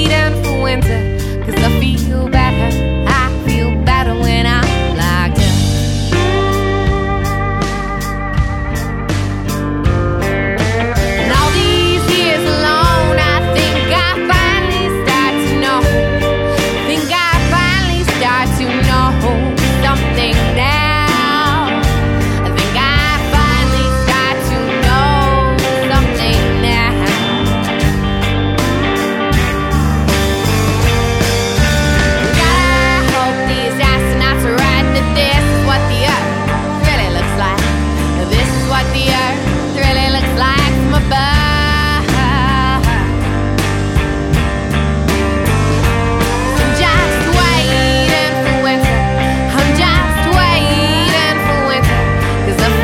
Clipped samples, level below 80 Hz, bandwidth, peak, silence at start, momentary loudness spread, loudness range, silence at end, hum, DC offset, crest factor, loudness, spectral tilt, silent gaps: under 0.1%; -20 dBFS; 17 kHz; 0 dBFS; 0 s; 4 LU; 2 LU; 0 s; none; under 0.1%; 12 dB; -13 LUFS; -5 dB/octave; none